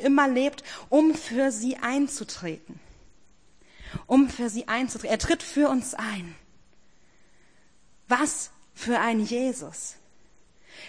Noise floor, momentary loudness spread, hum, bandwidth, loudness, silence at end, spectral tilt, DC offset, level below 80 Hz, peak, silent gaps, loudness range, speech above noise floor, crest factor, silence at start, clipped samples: -62 dBFS; 15 LU; none; 10.5 kHz; -26 LUFS; 0 s; -4 dB/octave; 0.2%; -52 dBFS; -6 dBFS; none; 3 LU; 37 dB; 20 dB; 0 s; under 0.1%